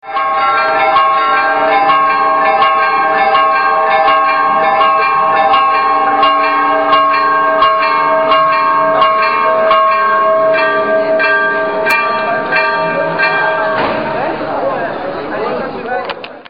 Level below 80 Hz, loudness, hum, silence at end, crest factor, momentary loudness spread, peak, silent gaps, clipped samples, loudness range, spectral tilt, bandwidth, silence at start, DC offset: -52 dBFS; -11 LUFS; none; 0.1 s; 12 dB; 7 LU; 0 dBFS; none; under 0.1%; 4 LU; -5 dB/octave; 7 kHz; 0.05 s; 0.5%